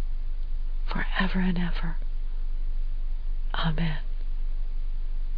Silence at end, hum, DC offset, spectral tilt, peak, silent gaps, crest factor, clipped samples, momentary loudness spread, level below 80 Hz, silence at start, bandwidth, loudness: 0 s; none; under 0.1%; -8.5 dB/octave; -12 dBFS; none; 14 dB; under 0.1%; 10 LU; -26 dBFS; 0 s; 4.9 kHz; -32 LUFS